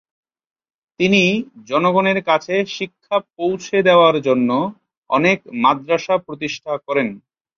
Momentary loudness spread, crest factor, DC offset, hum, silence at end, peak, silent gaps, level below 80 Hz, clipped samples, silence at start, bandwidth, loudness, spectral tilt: 11 LU; 16 dB; under 0.1%; none; 0.4 s; -2 dBFS; 4.97-5.02 s; -60 dBFS; under 0.1%; 1 s; 7.2 kHz; -18 LUFS; -5.5 dB/octave